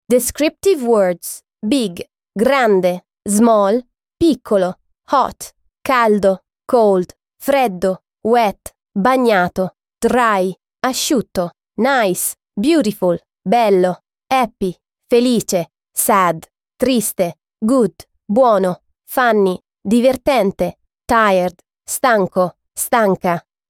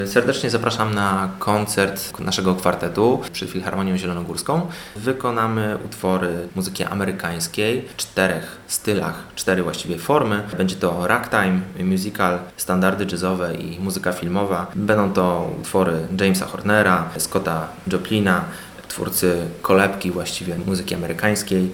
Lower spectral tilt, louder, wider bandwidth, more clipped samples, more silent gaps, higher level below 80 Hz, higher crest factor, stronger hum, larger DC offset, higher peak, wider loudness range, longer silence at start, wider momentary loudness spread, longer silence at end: about the same, -4.5 dB/octave vs -5 dB/octave; first, -16 LUFS vs -21 LUFS; about the same, 17.5 kHz vs 19 kHz; neither; neither; about the same, -50 dBFS vs -52 dBFS; second, 14 dB vs 20 dB; neither; neither; about the same, -2 dBFS vs 0 dBFS; about the same, 1 LU vs 3 LU; about the same, 0.1 s vs 0 s; first, 11 LU vs 7 LU; first, 0.3 s vs 0 s